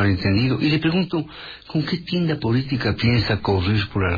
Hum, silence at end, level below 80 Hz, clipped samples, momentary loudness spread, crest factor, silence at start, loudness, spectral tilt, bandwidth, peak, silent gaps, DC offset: none; 0 s; -42 dBFS; under 0.1%; 7 LU; 14 dB; 0 s; -21 LUFS; -8 dB/octave; 5 kHz; -6 dBFS; none; under 0.1%